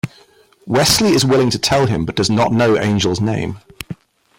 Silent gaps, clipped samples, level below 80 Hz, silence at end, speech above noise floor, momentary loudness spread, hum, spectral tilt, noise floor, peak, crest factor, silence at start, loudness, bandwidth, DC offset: none; under 0.1%; -42 dBFS; 0.45 s; 35 dB; 19 LU; none; -4.5 dB/octave; -50 dBFS; 0 dBFS; 16 dB; 0.05 s; -15 LUFS; 16.5 kHz; under 0.1%